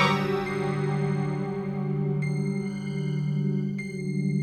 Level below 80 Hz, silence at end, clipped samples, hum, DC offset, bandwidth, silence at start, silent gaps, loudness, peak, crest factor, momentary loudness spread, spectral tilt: -58 dBFS; 0 s; under 0.1%; none; under 0.1%; 9 kHz; 0 s; none; -28 LUFS; -8 dBFS; 18 dB; 4 LU; -7.5 dB/octave